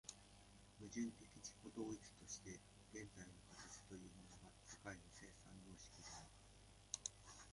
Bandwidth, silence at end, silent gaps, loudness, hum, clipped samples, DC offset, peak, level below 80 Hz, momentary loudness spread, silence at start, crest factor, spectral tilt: 11.5 kHz; 0 s; none; -56 LUFS; none; under 0.1%; under 0.1%; -26 dBFS; -72 dBFS; 14 LU; 0.05 s; 30 dB; -3.5 dB/octave